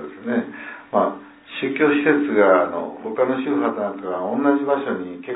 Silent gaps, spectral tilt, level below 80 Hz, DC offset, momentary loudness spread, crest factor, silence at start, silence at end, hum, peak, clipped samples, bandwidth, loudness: none; -10 dB/octave; -70 dBFS; under 0.1%; 12 LU; 18 dB; 0 s; 0 s; none; -2 dBFS; under 0.1%; 4 kHz; -21 LUFS